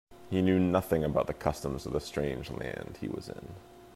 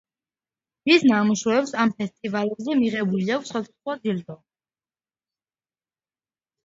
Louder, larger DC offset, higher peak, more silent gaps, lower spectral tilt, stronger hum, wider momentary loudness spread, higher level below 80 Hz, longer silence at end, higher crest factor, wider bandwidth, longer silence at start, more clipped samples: second, -32 LUFS vs -23 LUFS; neither; second, -12 dBFS vs -4 dBFS; neither; first, -7 dB/octave vs -5 dB/octave; neither; about the same, 15 LU vs 13 LU; first, -50 dBFS vs -68 dBFS; second, 0 s vs 2.3 s; about the same, 20 dB vs 22 dB; first, 15.5 kHz vs 7.8 kHz; second, 0.1 s vs 0.85 s; neither